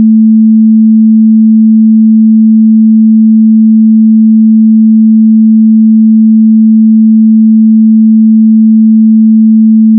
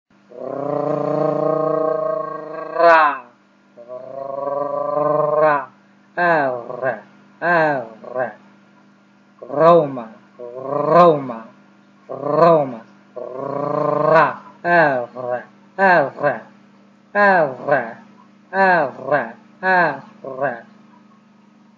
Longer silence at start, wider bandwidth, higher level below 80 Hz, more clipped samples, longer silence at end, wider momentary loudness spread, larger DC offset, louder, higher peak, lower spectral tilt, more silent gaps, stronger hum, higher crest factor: second, 0 s vs 0.3 s; second, 0.3 kHz vs 7.2 kHz; about the same, -78 dBFS vs -76 dBFS; first, 0.6% vs under 0.1%; second, 0 s vs 1.15 s; second, 0 LU vs 19 LU; neither; first, -4 LUFS vs -18 LUFS; about the same, 0 dBFS vs 0 dBFS; first, -26 dB/octave vs -7.5 dB/octave; neither; neither; second, 4 dB vs 18 dB